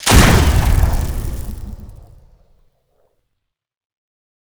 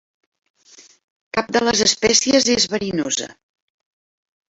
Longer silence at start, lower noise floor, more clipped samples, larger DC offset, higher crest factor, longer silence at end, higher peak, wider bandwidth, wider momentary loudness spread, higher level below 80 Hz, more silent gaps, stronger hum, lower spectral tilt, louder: second, 0 s vs 1.35 s; first, -75 dBFS vs -49 dBFS; neither; neither; about the same, 18 dB vs 20 dB; first, 2.55 s vs 1.15 s; about the same, 0 dBFS vs -2 dBFS; first, over 20 kHz vs 8.2 kHz; first, 23 LU vs 11 LU; first, -20 dBFS vs -54 dBFS; neither; neither; first, -4.5 dB/octave vs -2 dB/octave; about the same, -15 LUFS vs -17 LUFS